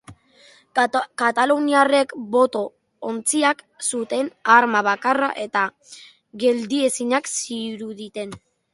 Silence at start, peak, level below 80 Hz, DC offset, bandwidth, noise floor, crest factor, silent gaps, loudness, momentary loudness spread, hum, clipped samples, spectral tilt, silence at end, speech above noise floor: 0.1 s; 0 dBFS; -68 dBFS; under 0.1%; 11.5 kHz; -53 dBFS; 20 dB; none; -20 LUFS; 15 LU; none; under 0.1%; -2.5 dB/octave; 0.35 s; 32 dB